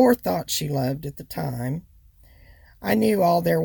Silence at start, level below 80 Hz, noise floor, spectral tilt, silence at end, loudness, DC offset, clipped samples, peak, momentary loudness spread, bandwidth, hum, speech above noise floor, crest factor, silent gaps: 0 s; -52 dBFS; -52 dBFS; -5.5 dB/octave; 0 s; -24 LUFS; under 0.1%; under 0.1%; -6 dBFS; 14 LU; 19.5 kHz; none; 30 dB; 18 dB; none